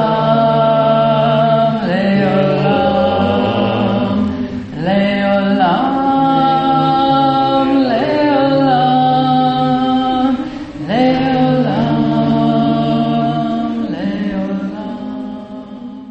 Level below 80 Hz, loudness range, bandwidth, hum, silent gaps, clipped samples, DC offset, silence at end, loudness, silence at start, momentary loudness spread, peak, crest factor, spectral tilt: -44 dBFS; 3 LU; 8 kHz; none; none; under 0.1%; under 0.1%; 0 s; -14 LUFS; 0 s; 10 LU; 0 dBFS; 12 dB; -8.5 dB/octave